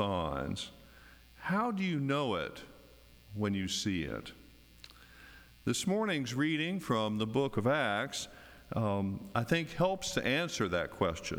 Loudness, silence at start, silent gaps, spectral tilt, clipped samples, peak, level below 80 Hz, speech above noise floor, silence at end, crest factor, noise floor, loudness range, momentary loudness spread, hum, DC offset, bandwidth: -34 LUFS; 0 s; none; -5 dB/octave; under 0.1%; -16 dBFS; -58 dBFS; 25 dB; 0 s; 20 dB; -58 dBFS; 4 LU; 19 LU; none; under 0.1%; over 20 kHz